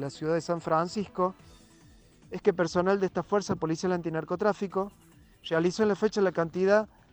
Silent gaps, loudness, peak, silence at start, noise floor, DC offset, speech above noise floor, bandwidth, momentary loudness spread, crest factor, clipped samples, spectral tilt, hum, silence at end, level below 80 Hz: none; -28 LUFS; -10 dBFS; 0 s; -56 dBFS; under 0.1%; 29 dB; 19.5 kHz; 7 LU; 18 dB; under 0.1%; -6 dB/octave; none; 0.25 s; -62 dBFS